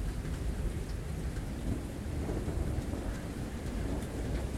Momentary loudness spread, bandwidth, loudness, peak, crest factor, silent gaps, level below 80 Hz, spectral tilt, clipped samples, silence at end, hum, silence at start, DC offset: 3 LU; 15.5 kHz; -38 LUFS; -22 dBFS; 14 dB; none; -38 dBFS; -6.5 dB/octave; under 0.1%; 0 s; none; 0 s; under 0.1%